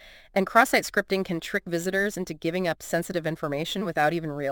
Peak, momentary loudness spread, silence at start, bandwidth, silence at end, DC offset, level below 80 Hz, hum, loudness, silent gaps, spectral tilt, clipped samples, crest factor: -4 dBFS; 9 LU; 0 s; 17 kHz; 0 s; under 0.1%; -56 dBFS; none; -26 LUFS; none; -4.5 dB/octave; under 0.1%; 22 dB